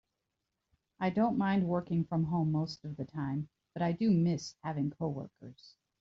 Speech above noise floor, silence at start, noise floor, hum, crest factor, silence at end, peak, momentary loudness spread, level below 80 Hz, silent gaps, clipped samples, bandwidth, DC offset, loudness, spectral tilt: 53 dB; 1 s; -86 dBFS; none; 14 dB; 0.3 s; -18 dBFS; 13 LU; -66 dBFS; none; under 0.1%; 7.6 kHz; under 0.1%; -33 LUFS; -7.5 dB/octave